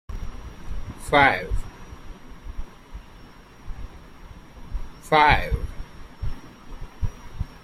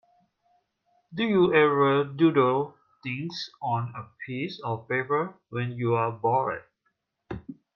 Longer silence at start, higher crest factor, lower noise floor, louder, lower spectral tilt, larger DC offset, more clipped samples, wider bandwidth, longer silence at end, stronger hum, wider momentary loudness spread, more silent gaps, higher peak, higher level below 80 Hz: second, 0.1 s vs 1.1 s; about the same, 24 dB vs 20 dB; second, -46 dBFS vs -76 dBFS; first, -22 LUFS vs -26 LUFS; second, -5 dB/octave vs -7.5 dB/octave; neither; neither; first, 14.5 kHz vs 7 kHz; second, 0.05 s vs 0.2 s; neither; first, 27 LU vs 18 LU; neither; first, -2 dBFS vs -8 dBFS; first, -34 dBFS vs -64 dBFS